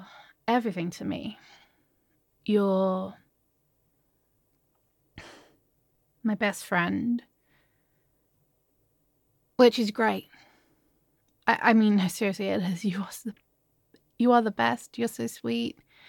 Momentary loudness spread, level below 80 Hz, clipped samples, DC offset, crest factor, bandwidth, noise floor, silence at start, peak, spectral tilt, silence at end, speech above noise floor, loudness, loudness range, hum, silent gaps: 15 LU; -70 dBFS; under 0.1%; under 0.1%; 22 dB; 17.5 kHz; -72 dBFS; 0 s; -6 dBFS; -5.5 dB/octave; 0.4 s; 46 dB; -27 LUFS; 8 LU; none; none